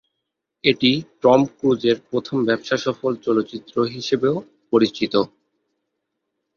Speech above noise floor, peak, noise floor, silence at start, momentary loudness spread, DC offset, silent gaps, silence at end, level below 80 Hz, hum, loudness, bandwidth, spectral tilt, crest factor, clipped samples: 60 dB; -2 dBFS; -79 dBFS; 0.65 s; 7 LU; under 0.1%; none; 1.3 s; -60 dBFS; none; -20 LUFS; 7.2 kHz; -5.5 dB/octave; 20 dB; under 0.1%